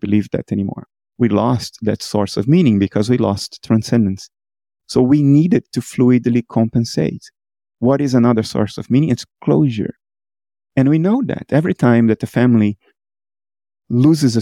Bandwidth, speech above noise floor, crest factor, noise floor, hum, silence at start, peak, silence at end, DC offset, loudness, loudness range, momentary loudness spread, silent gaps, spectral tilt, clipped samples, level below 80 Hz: 13 kHz; over 75 dB; 14 dB; under -90 dBFS; none; 0.05 s; -2 dBFS; 0 s; under 0.1%; -16 LUFS; 2 LU; 9 LU; none; -7.5 dB/octave; under 0.1%; -52 dBFS